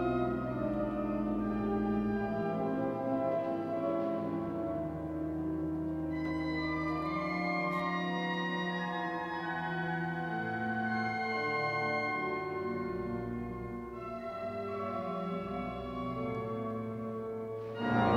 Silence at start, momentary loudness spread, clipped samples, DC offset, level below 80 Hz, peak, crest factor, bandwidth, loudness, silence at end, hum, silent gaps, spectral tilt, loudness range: 0 s; 7 LU; under 0.1%; under 0.1%; -56 dBFS; -18 dBFS; 18 dB; 10.5 kHz; -35 LUFS; 0 s; none; none; -8 dB/octave; 4 LU